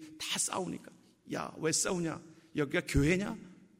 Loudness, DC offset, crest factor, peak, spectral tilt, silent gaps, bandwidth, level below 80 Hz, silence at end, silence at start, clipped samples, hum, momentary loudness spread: -33 LUFS; under 0.1%; 20 dB; -14 dBFS; -4 dB/octave; none; 16 kHz; -48 dBFS; 0.25 s; 0 s; under 0.1%; none; 12 LU